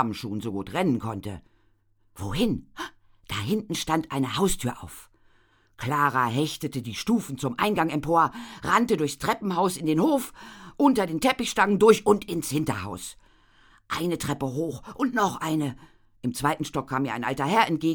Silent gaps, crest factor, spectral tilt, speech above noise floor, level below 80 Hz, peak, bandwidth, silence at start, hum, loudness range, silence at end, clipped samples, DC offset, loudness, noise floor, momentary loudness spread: none; 22 dB; -5 dB/octave; 38 dB; -50 dBFS; -4 dBFS; over 20 kHz; 0 s; none; 7 LU; 0 s; under 0.1%; under 0.1%; -26 LUFS; -64 dBFS; 13 LU